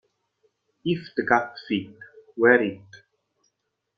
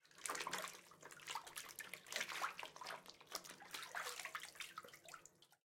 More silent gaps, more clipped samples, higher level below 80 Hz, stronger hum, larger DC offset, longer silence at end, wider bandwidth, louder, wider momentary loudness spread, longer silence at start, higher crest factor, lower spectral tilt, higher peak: neither; neither; first, -68 dBFS vs -88 dBFS; neither; neither; first, 1 s vs 0.1 s; second, 6.4 kHz vs 16.5 kHz; first, -23 LUFS vs -49 LUFS; first, 22 LU vs 13 LU; first, 0.85 s vs 0.05 s; about the same, 24 dB vs 28 dB; first, -7 dB/octave vs 0 dB/octave; first, -4 dBFS vs -24 dBFS